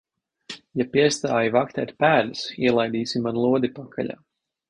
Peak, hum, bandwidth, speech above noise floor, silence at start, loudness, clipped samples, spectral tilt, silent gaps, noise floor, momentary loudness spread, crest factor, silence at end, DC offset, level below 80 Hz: -4 dBFS; none; 10.5 kHz; 21 dB; 0.5 s; -23 LUFS; under 0.1%; -5 dB/octave; none; -43 dBFS; 12 LU; 18 dB; 0.55 s; under 0.1%; -62 dBFS